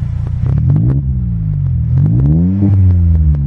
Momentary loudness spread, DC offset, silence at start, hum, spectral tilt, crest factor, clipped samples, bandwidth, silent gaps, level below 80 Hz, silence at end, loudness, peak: 6 LU; under 0.1%; 0 s; none; -12.5 dB/octave; 10 dB; under 0.1%; 2.5 kHz; none; -18 dBFS; 0 s; -13 LUFS; -2 dBFS